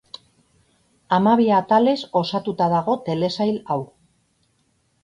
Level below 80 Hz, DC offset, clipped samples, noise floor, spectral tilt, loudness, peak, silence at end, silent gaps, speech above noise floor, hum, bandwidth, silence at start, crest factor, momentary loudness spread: -62 dBFS; under 0.1%; under 0.1%; -66 dBFS; -7 dB/octave; -20 LUFS; -4 dBFS; 1.2 s; none; 46 dB; none; 10.5 kHz; 1.1 s; 18 dB; 11 LU